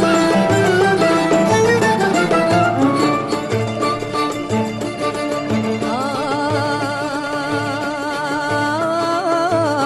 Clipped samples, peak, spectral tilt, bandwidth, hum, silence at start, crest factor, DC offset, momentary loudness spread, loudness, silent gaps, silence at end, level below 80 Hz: under 0.1%; -4 dBFS; -5 dB/octave; 13 kHz; none; 0 s; 12 dB; under 0.1%; 7 LU; -17 LUFS; none; 0 s; -48 dBFS